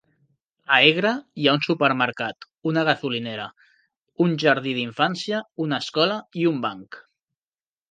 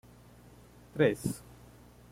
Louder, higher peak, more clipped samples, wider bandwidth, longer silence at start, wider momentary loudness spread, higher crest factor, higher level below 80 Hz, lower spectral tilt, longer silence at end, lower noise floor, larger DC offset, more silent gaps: first, -22 LUFS vs -31 LUFS; first, 0 dBFS vs -14 dBFS; neither; second, 9.2 kHz vs 16.5 kHz; second, 0.7 s vs 0.95 s; second, 14 LU vs 26 LU; about the same, 24 dB vs 22 dB; second, -72 dBFS vs -60 dBFS; about the same, -5.5 dB/octave vs -6 dB/octave; first, 0.9 s vs 0.75 s; first, under -90 dBFS vs -56 dBFS; neither; first, 3.97-4.02 s vs none